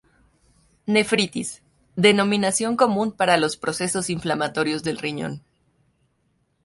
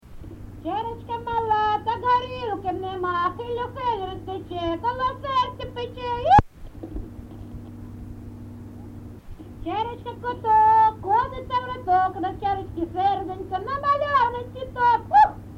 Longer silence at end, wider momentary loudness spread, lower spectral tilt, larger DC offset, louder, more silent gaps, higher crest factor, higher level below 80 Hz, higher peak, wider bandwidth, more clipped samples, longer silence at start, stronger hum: first, 1.25 s vs 0 s; second, 14 LU vs 22 LU; second, -4 dB/octave vs -6.5 dB/octave; neither; about the same, -22 LUFS vs -23 LUFS; neither; about the same, 20 dB vs 22 dB; second, -60 dBFS vs -44 dBFS; about the same, -4 dBFS vs -2 dBFS; first, 11.5 kHz vs 8 kHz; neither; first, 0.85 s vs 0.05 s; neither